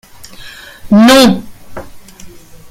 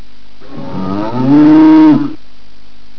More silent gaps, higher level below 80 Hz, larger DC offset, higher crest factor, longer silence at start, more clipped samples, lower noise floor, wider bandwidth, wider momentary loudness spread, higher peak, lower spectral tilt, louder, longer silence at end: neither; first, -38 dBFS vs -44 dBFS; second, under 0.1% vs 10%; about the same, 12 dB vs 10 dB; about the same, 0.4 s vs 0.5 s; first, 0.2% vs under 0.1%; second, -33 dBFS vs -44 dBFS; first, 16.5 kHz vs 5.4 kHz; first, 26 LU vs 18 LU; about the same, 0 dBFS vs -2 dBFS; second, -4.5 dB/octave vs -9 dB/octave; about the same, -7 LUFS vs -8 LUFS; second, 0.15 s vs 0.85 s